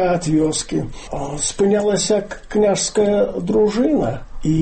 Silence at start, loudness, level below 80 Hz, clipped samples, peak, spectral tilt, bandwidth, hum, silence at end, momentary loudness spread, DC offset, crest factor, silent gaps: 0 s; -18 LUFS; -36 dBFS; under 0.1%; -6 dBFS; -5 dB/octave; 8.8 kHz; none; 0 s; 9 LU; under 0.1%; 12 dB; none